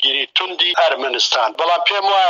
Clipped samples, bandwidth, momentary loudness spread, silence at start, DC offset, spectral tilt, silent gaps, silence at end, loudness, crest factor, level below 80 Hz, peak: under 0.1%; 7.6 kHz; 2 LU; 0 s; under 0.1%; 1.5 dB/octave; none; 0 s; -15 LUFS; 14 dB; -82 dBFS; -2 dBFS